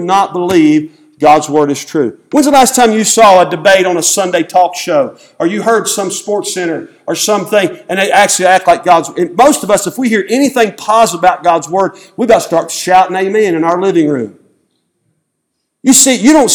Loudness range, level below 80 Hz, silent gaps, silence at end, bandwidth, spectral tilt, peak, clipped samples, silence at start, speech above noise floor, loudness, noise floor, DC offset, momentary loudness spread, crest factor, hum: 5 LU; -50 dBFS; none; 0 s; over 20 kHz; -3 dB/octave; 0 dBFS; 0.9%; 0 s; 59 dB; -10 LUFS; -69 dBFS; under 0.1%; 9 LU; 10 dB; none